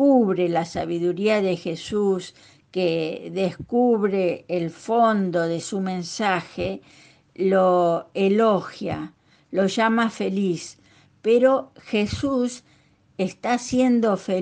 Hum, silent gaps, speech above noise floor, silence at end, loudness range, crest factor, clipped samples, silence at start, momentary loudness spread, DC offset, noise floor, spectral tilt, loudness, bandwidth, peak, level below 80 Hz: none; none; 36 dB; 0 s; 2 LU; 16 dB; under 0.1%; 0 s; 11 LU; under 0.1%; -58 dBFS; -6 dB/octave; -23 LUFS; 9.8 kHz; -8 dBFS; -56 dBFS